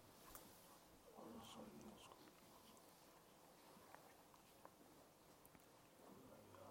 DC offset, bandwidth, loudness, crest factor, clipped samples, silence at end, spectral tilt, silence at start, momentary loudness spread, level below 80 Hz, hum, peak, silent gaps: under 0.1%; 16.5 kHz; -64 LUFS; 24 dB; under 0.1%; 0 s; -3.5 dB/octave; 0 s; 8 LU; -84 dBFS; none; -40 dBFS; none